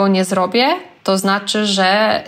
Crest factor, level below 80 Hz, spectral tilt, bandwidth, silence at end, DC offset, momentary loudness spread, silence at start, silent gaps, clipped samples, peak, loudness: 12 dB; -64 dBFS; -4 dB/octave; 15.5 kHz; 0 s; under 0.1%; 5 LU; 0 s; none; under 0.1%; -4 dBFS; -15 LUFS